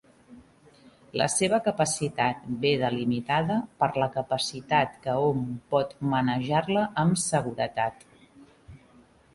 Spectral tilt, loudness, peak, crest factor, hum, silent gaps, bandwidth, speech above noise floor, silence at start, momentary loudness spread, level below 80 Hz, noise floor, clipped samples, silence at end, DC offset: -4.5 dB/octave; -27 LUFS; -8 dBFS; 18 dB; none; none; 11.5 kHz; 31 dB; 0.3 s; 4 LU; -60 dBFS; -57 dBFS; under 0.1%; 0.6 s; under 0.1%